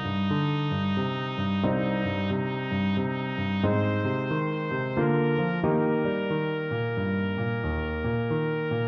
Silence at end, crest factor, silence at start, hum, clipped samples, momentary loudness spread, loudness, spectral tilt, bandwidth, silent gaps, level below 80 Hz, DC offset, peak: 0 s; 14 dB; 0 s; none; under 0.1%; 4 LU; -27 LUFS; -9 dB/octave; 6.2 kHz; none; -48 dBFS; under 0.1%; -12 dBFS